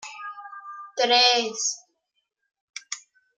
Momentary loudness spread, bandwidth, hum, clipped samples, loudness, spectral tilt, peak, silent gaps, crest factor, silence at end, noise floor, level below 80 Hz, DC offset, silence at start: 23 LU; 10 kHz; none; under 0.1%; -20 LUFS; 1 dB/octave; -6 dBFS; 2.61-2.68 s; 20 dB; 0.4 s; -77 dBFS; -88 dBFS; under 0.1%; 0 s